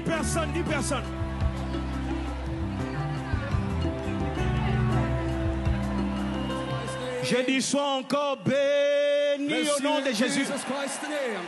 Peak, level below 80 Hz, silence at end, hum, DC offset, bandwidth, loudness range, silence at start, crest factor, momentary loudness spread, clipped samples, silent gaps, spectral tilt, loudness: -12 dBFS; -36 dBFS; 0 s; none; under 0.1%; 12.5 kHz; 5 LU; 0 s; 14 dB; 7 LU; under 0.1%; none; -5 dB/octave; -27 LUFS